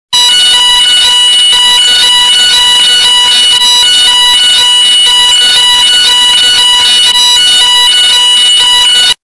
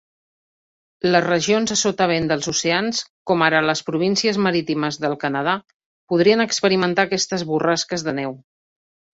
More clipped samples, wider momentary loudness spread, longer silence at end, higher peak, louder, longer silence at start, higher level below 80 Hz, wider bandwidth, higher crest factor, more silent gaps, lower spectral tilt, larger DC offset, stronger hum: first, 0.1% vs under 0.1%; second, 0 LU vs 7 LU; second, 0.1 s vs 0.8 s; about the same, 0 dBFS vs -2 dBFS; first, -2 LUFS vs -19 LUFS; second, 0.1 s vs 1.05 s; first, -40 dBFS vs -60 dBFS; first, 12 kHz vs 8 kHz; second, 6 dB vs 18 dB; second, none vs 3.10-3.26 s, 5.74-5.80 s, 5.86-6.07 s; second, 3 dB/octave vs -3.5 dB/octave; neither; neither